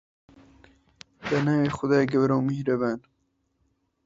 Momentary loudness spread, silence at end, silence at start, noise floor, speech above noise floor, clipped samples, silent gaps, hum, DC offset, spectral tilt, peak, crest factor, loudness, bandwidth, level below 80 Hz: 8 LU; 1.05 s; 1.2 s; -73 dBFS; 49 dB; under 0.1%; none; none; under 0.1%; -7.5 dB/octave; -8 dBFS; 18 dB; -24 LUFS; 7.8 kHz; -60 dBFS